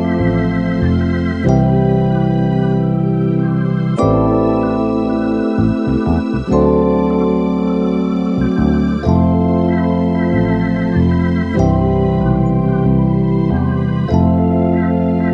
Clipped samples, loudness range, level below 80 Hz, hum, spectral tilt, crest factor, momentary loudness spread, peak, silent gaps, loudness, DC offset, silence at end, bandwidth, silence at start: under 0.1%; 1 LU; -30 dBFS; none; -9.5 dB/octave; 12 dB; 3 LU; 0 dBFS; none; -15 LUFS; 0.2%; 0 s; 7 kHz; 0 s